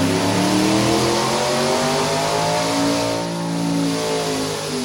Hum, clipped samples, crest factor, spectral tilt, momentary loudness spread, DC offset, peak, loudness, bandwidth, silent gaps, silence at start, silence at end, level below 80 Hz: none; under 0.1%; 14 dB; -4 dB/octave; 6 LU; under 0.1%; -6 dBFS; -19 LUFS; 17 kHz; none; 0 s; 0 s; -48 dBFS